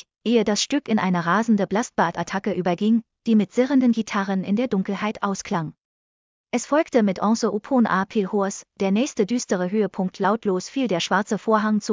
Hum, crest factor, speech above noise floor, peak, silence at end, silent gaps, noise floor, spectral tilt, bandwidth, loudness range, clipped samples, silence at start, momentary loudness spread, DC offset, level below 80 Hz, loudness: none; 18 dB; over 68 dB; -4 dBFS; 0 s; 5.85-6.44 s; under -90 dBFS; -5.5 dB/octave; 7.6 kHz; 3 LU; under 0.1%; 0.25 s; 6 LU; under 0.1%; -62 dBFS; -22 LUFS